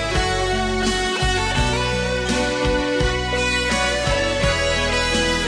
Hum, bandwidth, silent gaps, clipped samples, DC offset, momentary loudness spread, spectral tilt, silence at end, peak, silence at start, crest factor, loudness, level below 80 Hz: none; 10.5 kHz; none; under 0.1%; under 0.1%; 2 LU; -3.5 dB/octave; 0 s; -6 dBFS; 0 s; 14 dB; -20 LUFS; -28 dBFS